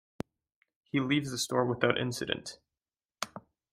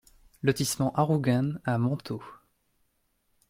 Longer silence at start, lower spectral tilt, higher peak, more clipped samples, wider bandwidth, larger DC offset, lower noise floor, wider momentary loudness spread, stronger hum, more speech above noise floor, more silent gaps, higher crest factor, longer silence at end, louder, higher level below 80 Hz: first, 0.95 s vs 0.45 s; second, -4.5 dB/octave vs -6 dB/octave; about the same, -10 dBFS vs -8 dBFS; neither; about the same, 16 kHz vs 16.5 kHz; neither; first, under -90 dBFS vs -73 dBFS; first, 16 LU vs 9 LU; neither; first, over 59 dB vs 46 dB; first, 3.05-3.09 s vs none; about the same, 24 dB vs 20 dB; second, 0.35 s vs 1.15 s; second, -32 LUFS vs -28 LUFS; second, -66 dBFS vs -60 dBFS